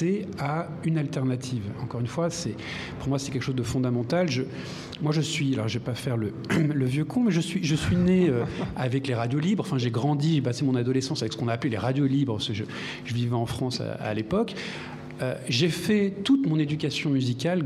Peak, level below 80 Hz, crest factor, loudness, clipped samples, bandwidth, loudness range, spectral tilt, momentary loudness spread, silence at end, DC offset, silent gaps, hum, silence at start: -10 dBFS; -52 dBFS; 16 dB; -27 LUFS; under 0.1%; 14.5 kHz; 4 LU; -6 dB/octave; 8 LU; 0 s; under 0.1%; none; none; 0 s